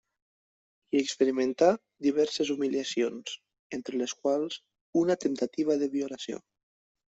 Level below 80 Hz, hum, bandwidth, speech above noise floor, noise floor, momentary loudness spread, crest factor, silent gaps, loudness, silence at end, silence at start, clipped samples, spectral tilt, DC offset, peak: -74 dBFS; none; 8.2 kHz; over 62 dB; under -90 dBFS; 14 LU; 20 dB; 3.59-3.70 s, 4.81-4.93 s; -29 LUFS; 0.7 s; 0.95 s; under 0.1%; -4 dB/octave; under 0.1%; -10 dBFS